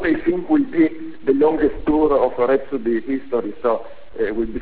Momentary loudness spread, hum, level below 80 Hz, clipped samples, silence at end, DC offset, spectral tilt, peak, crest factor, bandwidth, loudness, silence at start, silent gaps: 8 LU; none; -42 dBFS; under 0.1%; 0 s; 2%; -10.5 dB/octave; -4 dBFS; 14 dB; 4 kHz; -20 LUFS; 0 s; none